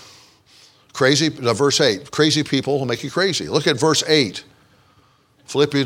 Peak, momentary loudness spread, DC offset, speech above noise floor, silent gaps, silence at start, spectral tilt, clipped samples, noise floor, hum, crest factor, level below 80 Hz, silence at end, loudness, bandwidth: -2 dBFS; 7 LU; under 0.1%; 38 dB; none; 0.95 s; -4 dB/octave; under 0.1%; -56 dBFS; none; 18 dB; -60 dBFS; 0 s; -18 LUFS; 16.5 kHz